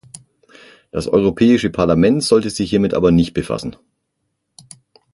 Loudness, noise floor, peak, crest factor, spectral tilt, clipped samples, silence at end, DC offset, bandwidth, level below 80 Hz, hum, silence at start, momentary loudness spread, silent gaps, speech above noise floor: -16 LUFS; -72 dBFS; -2 dBFS; 16 dB; -6 dB/octave; under 0.1%; 1.4 s; under 0.1%; 11.5 kHz; -40 dBFS; none; 0.95 s; 12 LU; none; 57 dB